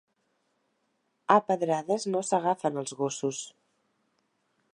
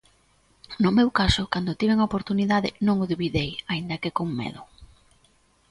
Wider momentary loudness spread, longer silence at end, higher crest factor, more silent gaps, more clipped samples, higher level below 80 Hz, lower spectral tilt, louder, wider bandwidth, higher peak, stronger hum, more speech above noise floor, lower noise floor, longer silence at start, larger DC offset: first, 12 LU vs 9 LU; first, 1.25 s vs 0.85 s; first, 26 dB vs 20 dB; neither; neither; second, -84 dBFS vs -44 dBFS; second, -4.5 dB/octave vs -6 dB/octave; second, -28 LUFS vs -24 LUFS; about the same, 11.5 kHz vs 11.5 kHz; about the same, -6 dBFS vs -6 dBFS; neither; first, 48 dB vs 38 dB; first, -75 dBFS vs -62 dBFS; first, 1.3 s vs 0.7 s; neither